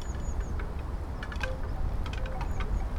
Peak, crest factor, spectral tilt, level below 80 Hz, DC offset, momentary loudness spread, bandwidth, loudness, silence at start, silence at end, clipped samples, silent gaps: -16 dBFS; 14 dB; -6 dB/octave; -32 dBFS; under 0.1%; 3 LU; 12 kHz; -36 LUFS; 0 s; 0 s; under 0.1%; none